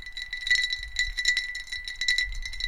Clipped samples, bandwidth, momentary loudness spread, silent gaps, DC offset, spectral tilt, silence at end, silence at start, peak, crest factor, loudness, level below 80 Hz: under 0.1%; 16.5 kHz; 10 LU; none; under 0.1%; 2 dB/octave; 0 s; 0 s; -6 dBFS; 22 dB; -26 LUFS; -42 dBFS